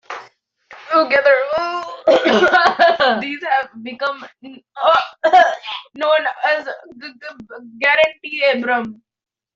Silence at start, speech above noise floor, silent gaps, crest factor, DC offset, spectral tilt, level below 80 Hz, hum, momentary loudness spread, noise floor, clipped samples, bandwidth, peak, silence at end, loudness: 0.1 s; 32 dB; none; 16 dB; under 0.1%; -3.5 dB/octave; -62 dBFS; none; 20 LU; -49 dBFS; under 0.1%; 7.6 kHz; 0 dBFS; 0.6 s; -16 LUFS